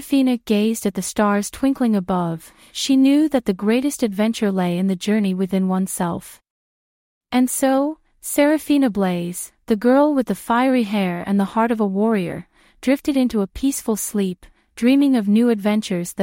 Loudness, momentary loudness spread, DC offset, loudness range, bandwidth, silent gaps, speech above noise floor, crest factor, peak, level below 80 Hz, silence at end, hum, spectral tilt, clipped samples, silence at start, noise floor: -19 LUFS; 9 LU; under 0.1%; 3 LU; 16.5 kHz; 6.50-7.21 s; over 71 dB; 16 dB; -4 dBFS; -52 dBFS; 0 s; none; -5.5 dB/octave; under 0.1%; 0 s; under -90 dBFS